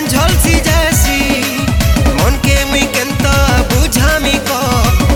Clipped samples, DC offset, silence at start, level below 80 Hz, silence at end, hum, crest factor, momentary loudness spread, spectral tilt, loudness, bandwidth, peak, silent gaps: under 0.1%; under 0.1%; 0 s; -16 dBFS; 0 s; none; 10 dB; 3 LU; -4 dB/octave; -11 LUFS; 17.5 kHz; 0 dBFS; none